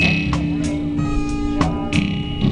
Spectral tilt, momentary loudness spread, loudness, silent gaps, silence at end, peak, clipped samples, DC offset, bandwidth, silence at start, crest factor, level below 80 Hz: -6 dB/octave; 3 LU; -21 LUFS; none; 0 s; 0 dBFS; under 0.1%; under 0.1%; 10 kHz; 0 s; 18 dB; -28 dBFS